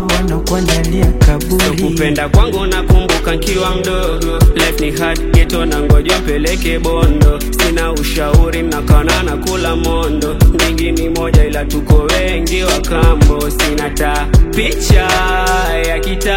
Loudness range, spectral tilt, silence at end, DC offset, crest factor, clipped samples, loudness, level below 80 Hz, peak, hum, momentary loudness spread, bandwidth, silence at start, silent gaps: 1 LU; -5 dB/octave; 0 s; under 0.1%; 12 dB; 0.5%; -13 LUFS; -14 dBFS; 0 dBFS; none; 5 LU; 17 kHz; 0 s; none